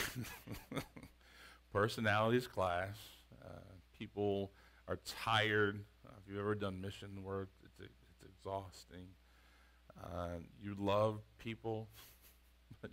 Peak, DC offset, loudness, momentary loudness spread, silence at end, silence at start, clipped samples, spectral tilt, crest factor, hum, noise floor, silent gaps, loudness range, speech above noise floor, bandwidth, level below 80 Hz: -18 dBFS; under 0.1%; -40 LUFS; 24 LU; 0 s; 0 s; under 0.1%; -5.5 dB/octave; 24 dB; none; -66 dBFS; none; 11 LU; 27 dB; 16 kHz; -66 dBFS